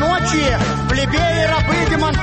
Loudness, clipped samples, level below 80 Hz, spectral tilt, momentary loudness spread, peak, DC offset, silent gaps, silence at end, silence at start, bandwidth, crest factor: -16 LUFS; under 0.1%; -26 dBFS; -5 dB/octave; 2 LU; -6 dBFS; under 0.1%; none; 0 s; 0 s; 8.8 kHz; 10 dB